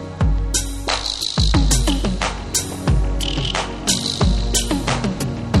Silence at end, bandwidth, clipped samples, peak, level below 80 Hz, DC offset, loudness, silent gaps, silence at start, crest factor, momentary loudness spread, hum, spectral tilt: 0 s; 13 kHz; under 0.1%; -2 dBFS; -22 dBFS; under 0.1%; -20 LUFS; none; 0 s; 18 dB; 5 LU; none; -4 dB/octave